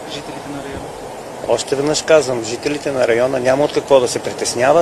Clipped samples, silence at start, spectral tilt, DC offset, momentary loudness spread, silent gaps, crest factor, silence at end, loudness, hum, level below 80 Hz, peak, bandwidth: under 0.1%; 0 s; -3.5 dB/octave; under 0.1%; 15 LU; none; 16 dB; 0 s; -16 LUFS; none; -50 dBFS; 0 dBFS; 13.5 kHz